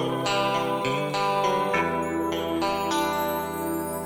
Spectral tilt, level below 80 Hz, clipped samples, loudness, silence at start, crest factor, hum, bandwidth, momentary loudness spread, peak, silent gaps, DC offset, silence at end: -4.5 dB/octave; -54 dBFS; under 0.1%; -25 LUFS; 0 s; 16 dB; none; 19 kHz; 4 LU; -10 dBFS; none; under 0.1%; 0 s